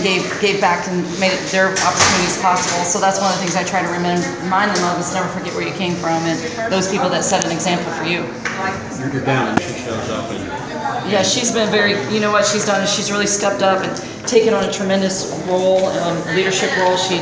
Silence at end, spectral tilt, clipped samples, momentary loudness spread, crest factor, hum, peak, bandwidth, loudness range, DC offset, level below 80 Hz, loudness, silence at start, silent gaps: 0 s; -3.5 dB/octave; under 0.1%; 8 LU; 18 dB; none; 0 dBFS; 8 kHz; 4 LU; under 0.1%; -48 dBFS; -17 LUFS; 0 s; none